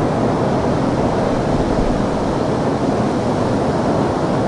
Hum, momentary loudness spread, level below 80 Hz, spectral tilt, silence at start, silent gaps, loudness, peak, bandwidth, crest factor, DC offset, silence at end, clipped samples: none; 1 LU; -32 dBFS; -7 dB/octave; 0 s; none; -18 LUFS; -4 dBFS; 11.5 kHz; 12 dB; under 0.1%; 0 s; under 0.1%